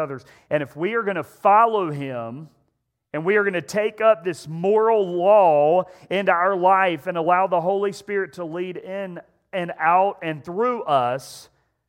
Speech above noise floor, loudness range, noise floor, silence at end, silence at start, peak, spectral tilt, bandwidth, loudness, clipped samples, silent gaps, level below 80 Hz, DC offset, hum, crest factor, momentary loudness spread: 52 dB; 5 LU; -73 dBFS; 0.45 s; 0 s; -2 dBFS; -6 dB/octave; 16.5 kHz; -21 LUFS; under 0.1%; none; -72 dBFS; under 0.1%; none; 18 dB; 15 LU